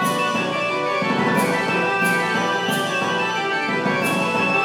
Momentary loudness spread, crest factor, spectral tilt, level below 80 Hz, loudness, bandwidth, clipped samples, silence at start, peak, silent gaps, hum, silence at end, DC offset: 3 LU; 12 dB; -4 dB/octave; -68 dBFS; -20 LUFS; 19 kHz; under 0.1%; 0 s; -8 dBFS; none; none; 0 s; under 0.1%